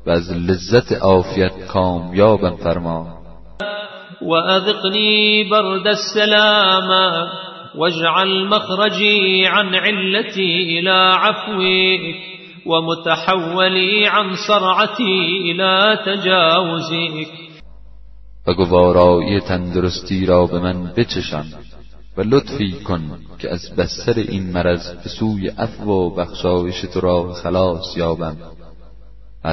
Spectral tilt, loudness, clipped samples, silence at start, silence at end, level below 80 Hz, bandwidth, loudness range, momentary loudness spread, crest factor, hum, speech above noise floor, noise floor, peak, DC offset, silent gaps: -5.5 dB/octave; -16 LUFS; under 0.1%; 0.05 s; 0 s; -42 dBFS; 6.2 kHz; 7 LU; 14 LU; 16 dB; none; 25 dB; -41 dBFS; 0 dBFS; 1%; none